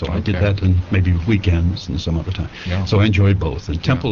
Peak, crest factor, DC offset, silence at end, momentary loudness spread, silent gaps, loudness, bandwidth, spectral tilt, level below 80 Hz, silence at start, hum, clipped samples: -2 dBFS; 14 dB; 0.3%; 0 s; 8 LU; none; -18 LUFS; 7 kHz; -6.5 dB/octave; -30 dBFS; 0 s; none; under 0.1%